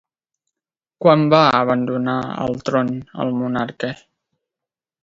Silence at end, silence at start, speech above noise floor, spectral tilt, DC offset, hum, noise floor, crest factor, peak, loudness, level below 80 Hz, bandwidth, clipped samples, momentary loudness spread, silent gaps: 1.1 s; 1 s; 70 dB; -7 dB/octave; under 0.1%; none; -88 dBFS; 20 dB; 0 dBFS; -18 LUFS; -58 dBFS; 7.6 kHz; under 0.1%; 12 LU; none